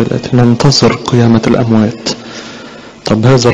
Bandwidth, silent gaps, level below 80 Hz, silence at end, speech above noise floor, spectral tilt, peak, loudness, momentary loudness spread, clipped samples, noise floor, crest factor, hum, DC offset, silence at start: 9.8 kHz; none; -36 dBFS; 0 s; 22 dB; -6 dB/octave; 0 dBFS; -10 LUFS; 18 LU; under 0.1%; -30 dBFS; 10 dB; none; under 0.1%; 0 s